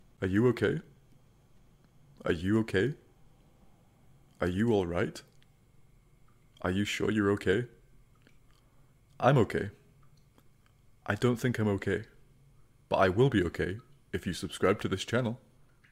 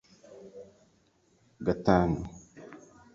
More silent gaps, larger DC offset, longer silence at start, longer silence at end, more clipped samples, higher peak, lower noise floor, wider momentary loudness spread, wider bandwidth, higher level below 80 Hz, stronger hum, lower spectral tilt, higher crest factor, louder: neither; neither; about the same, 0.2 s vs 0.3 s; first, 0.55 s vs 0.4 s; neither; second, -12 dBFS vs -8 dBFS; second, -62 dBFS vs -67 dBFS; second, 13 LU vs 26 LU; first, 16 kHz vs 7.6 kHz; second, -58 dBFS vs -50 dBFS; neither; second, -6.5 dB/octave vs -8 dB/octave; second, 20 dB vs 26 dB; about the same, -30 LUFS vs -28 LUFS